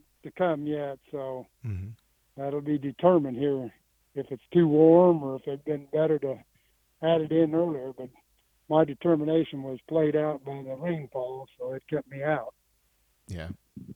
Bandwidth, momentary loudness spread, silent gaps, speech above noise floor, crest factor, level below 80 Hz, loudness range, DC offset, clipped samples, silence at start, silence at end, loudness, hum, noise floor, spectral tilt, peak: 4.5 kHz; 17 LU; none; 43 dB; 20 dB; -62 dBFS; 7 LU; under 0.1%; under 0.1%; 0.25 s; 0 s; -27 LUFS; none; -70 dBFS; -9 dB/octave; -8 dBFS